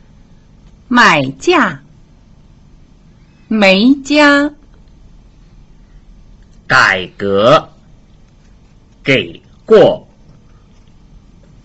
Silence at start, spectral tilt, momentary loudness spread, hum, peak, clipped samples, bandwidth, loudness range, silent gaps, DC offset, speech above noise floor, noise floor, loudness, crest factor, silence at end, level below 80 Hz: 0.9 s; -5 dB/octave; 12 LU; none; 0 dBFS; under 0.1%; 8.2 kHz; 2 LU; none; under 0.1%; 34 dB; -43 dBFS; -11 LUFS; 14 dB; 1.65 s; -44 dBFS